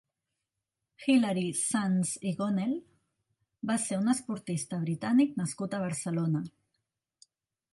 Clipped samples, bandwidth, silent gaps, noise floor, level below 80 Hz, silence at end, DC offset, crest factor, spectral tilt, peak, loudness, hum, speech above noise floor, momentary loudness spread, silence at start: under 0.1%; 11.5 kHz; none; -87 dBFS; -74 dBFS; 1.25 s; under 0.1%; 18 dB; -5 dB/octave; -14 dBFS; -30 LUFS; none; 58 dB; 8 LU; 1 s